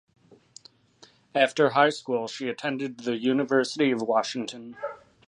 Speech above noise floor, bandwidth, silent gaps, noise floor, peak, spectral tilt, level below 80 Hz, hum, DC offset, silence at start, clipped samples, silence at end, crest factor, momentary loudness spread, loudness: 32 dB; 11 kHz; none; -57 dBFS; -6 dBFS; -4.5 dB/octave; -76 dBFS; none; under 0.1%; 1.35 s; under 0.1%; 0.3 s; 22 dB; 15 LU; -26 LUFS